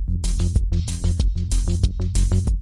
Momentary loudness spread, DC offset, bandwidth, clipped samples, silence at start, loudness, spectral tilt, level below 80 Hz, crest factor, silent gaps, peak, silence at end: 3 LU; under 0.1%; 11.5 kHz; under 0.1%; 0 s; -23 LUFS; -6 dB/octave; -22 dBFS; 14 dB; none; -6 dBFS; 0 s